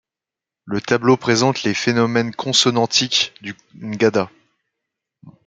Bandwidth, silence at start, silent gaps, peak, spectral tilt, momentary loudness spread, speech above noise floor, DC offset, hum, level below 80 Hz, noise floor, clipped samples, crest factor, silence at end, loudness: 9.4 kHz; 0.65 s; none; -2 dBFS; -3.5 dB/octave; 15 LU; 69 dB; under 0.1%; none; -60 dBFS; -87 dBFS; under 0.1%; 18 dB; 0.15 s; -17 LUFS